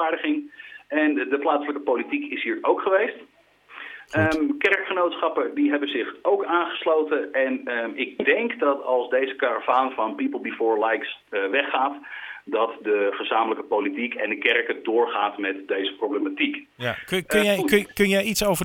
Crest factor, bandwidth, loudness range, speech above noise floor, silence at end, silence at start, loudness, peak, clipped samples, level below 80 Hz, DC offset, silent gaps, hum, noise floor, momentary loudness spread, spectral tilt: 22 dB; 19 kHz; 2 LU; 21 dB; 0 s; 0 s; -23 LUFS; -2 dBFS; under 0.1%; -58 dBFS; under 0.1%; none; 50 Hz at -65 dBFS; -45 dBFS; 7 LU; -4.5 dB/octave